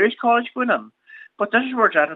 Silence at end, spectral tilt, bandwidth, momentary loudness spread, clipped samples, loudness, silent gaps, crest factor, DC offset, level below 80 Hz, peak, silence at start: 0 s; -6.5 dB/octave; 4.2 kHz; 6 LU; under 0.1%; -20 LUFS; none; 18 dB; under 0.1%; -82 dBFS; -2 dBFS; 0 s